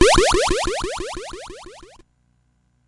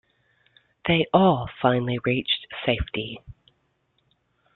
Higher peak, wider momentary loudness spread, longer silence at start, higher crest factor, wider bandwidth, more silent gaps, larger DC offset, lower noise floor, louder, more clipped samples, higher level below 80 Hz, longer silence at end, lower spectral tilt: first, 0 dBFS vs -4 dBFS; first, 23 LU vs 13 LU; second, 0 s vs 0.85 s; about the same, 20 dB vs 22 dB; first, 11.5 kHz vs 4.3 kHz; neither; neither; second, -63 dBFS vs -70 dBFS; first, -20 LUFS vs -23 LUFS; neither; first, -32 dBFS vs -46 dBFS; second, 1.05 s vs 1.25 s; second, -3 dB/octave vs -10 dB/octave